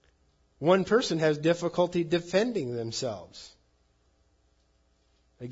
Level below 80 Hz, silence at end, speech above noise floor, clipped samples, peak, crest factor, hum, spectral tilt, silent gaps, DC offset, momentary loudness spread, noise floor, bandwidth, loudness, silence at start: -64 dBFS; 0 s; 41 dB; under 0.1%; -10 dBFS; 20 dB; none; -5.5 dB/octave; none; under 0.1%; 17 LU; -68 dBFS; 8 kHz; -27 LUFS; 0.6 s